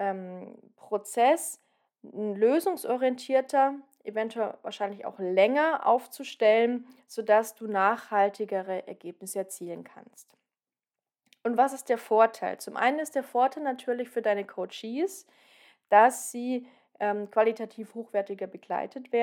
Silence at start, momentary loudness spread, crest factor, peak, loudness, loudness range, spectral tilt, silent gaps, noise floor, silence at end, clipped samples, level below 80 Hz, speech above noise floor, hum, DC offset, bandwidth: 0 s; 15 LU; 20 dB; -8 dBFS; -28 LUFS; 5 LU; -4 dB/octave; none; under -90 dBFS; 0 s; under 0.1%; under -90 dBFS; over 63 dB; none; under 0.1%; 18 kHz